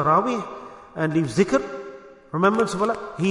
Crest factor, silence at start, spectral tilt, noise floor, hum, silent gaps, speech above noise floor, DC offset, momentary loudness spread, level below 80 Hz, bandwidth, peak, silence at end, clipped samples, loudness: 20 dB; 0 s; -6.5 dB/octave; -42 dBFS; none; none; 20 dB; under 0.1%; 17 LU; -56 dBFS; 11 kHz; -4 dBFS; 0 s; under 0.1%; -23 LUFS